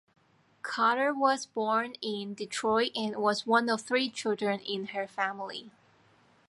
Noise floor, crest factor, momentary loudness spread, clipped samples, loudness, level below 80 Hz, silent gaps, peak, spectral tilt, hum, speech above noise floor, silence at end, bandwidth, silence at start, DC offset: -64 dBFS; 20 dB; 10 LU; under 0.1%; -30 LUFS; -78 dBFS; none; -10 dBFS; -3.5 dB/octave; none; 34 dB; 0.8 s; 11.5 kHz; 0.65 s; under 0.1%